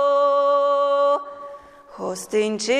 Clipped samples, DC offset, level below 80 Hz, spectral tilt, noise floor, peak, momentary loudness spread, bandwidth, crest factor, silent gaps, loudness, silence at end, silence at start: under 0.1%; under 0.1%; -68 dBFS; -3.5 dB/octave; -42 dBFS; -10 dBFS; 18 LU; 13 kHz; 10 dB; none; -20 LUFS; 0 s; 0 s